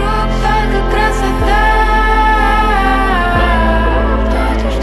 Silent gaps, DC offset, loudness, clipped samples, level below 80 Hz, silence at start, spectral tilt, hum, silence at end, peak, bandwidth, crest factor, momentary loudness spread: none; under 0.1%; -13 LUFS; under 0.1%; -14 dBFS; 0 s; -6 dB/octave; none; 0 s; 0 dBFS; 12 kHz; 10 dB; 4 LU